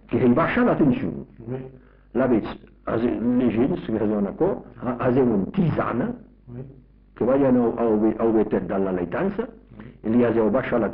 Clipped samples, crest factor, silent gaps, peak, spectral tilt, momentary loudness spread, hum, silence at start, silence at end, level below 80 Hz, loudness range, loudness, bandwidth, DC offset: under 0.1%; 12 dB; none; -10 dBFS; -7.5 dB/octave; 16 LU; none; 0.1 s; 0 s; -48 dBFS; 2 LU; -22 LUFS; 4.3 kHz; under 0.1%